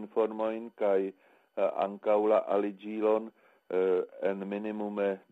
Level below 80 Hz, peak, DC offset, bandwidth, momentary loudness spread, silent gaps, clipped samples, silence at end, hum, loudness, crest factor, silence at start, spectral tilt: -80 dBFS; -16 dBFS; under 0.1%; 4.1 kHz; 8 LU; none; under 0.1%; 0.15 s; none; -31 LUFS; 16 dB; 0 s; -8.5 dB/octave